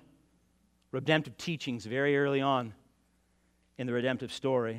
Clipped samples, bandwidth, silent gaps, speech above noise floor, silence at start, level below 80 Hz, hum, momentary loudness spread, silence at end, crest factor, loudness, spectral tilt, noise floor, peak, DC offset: under 0.1%; 13.5 kHz; none; 40 dB; 0.95 s; -72 dBFS; none; 10 LU; 0 s; 22 dB; -31 LUFS; -6 dB/octave; -71 dBFS; -10 dBFS; under 0.1%